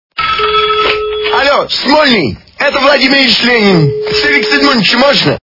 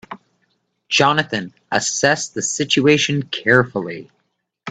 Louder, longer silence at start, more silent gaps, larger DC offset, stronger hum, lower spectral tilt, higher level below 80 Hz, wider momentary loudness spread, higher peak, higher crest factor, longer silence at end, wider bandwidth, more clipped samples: first, -8 LUFS vs -17 LUFS; about the same, 0.15 s vs 0.1 s; neither; first, 0.2% vs under 0.1%; neither; first, -5 dB/octave vs -3.5 dB/octave; first, -40 dBFS vs -58 dBFS; second, 6 LU vs 17 LU; about the same, 0 dBFS vs 0 dBFS; second, 10 dB vs 20 dB; about the same, 0.05 s vs 0 s; second, 6 kHz vs 9.4 kHz; first, 0.7% vs under 0.1%